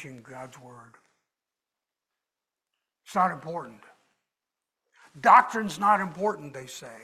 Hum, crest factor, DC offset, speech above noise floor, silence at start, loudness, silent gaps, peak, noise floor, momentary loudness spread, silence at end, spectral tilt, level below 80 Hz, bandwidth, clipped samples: none; 24 dB; under 0.1%; 63 dB; 0 s; -23 LUFS; none; -4 dBFS; -89 dBFS; 25 LU; 0.05 s; -4.5 dB/octave; -74 dBFS; 15 kHz; under 0.1%